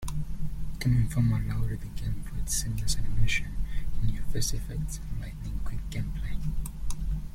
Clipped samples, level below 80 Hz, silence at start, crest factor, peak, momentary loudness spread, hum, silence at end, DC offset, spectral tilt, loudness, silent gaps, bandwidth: under 0.1%; -32 dBFS; 0 s; 16 dB; -10 dBFS; 11 LU; none; 0 s; under 0.1%; -4.5 dB/octave; -32 LUFS; none; 15.5 kHz